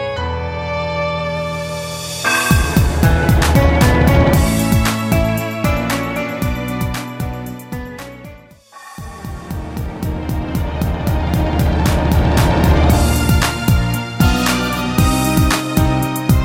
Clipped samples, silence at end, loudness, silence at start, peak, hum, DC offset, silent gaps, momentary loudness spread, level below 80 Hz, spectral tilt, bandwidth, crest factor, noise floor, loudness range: under 0.1%; 0 s; -16 LUFS; 0 s; 0 dBFS; none; under 0.1%; none; 15 LU; -22 dBFS; -5.5 dB/octave; 17 kHz; 16 dB; -40 dBFS; 12 LU